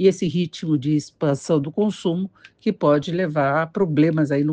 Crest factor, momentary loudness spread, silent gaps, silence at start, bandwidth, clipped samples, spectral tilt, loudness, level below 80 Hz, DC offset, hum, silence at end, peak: 16 dB; 6 LU; none; 0 s; 9.4 kHz; under 0.1%; -7 dB/octave; -21 LUFS; -62 dBFS; under 0.1%; none; 0 s; -4 dBFS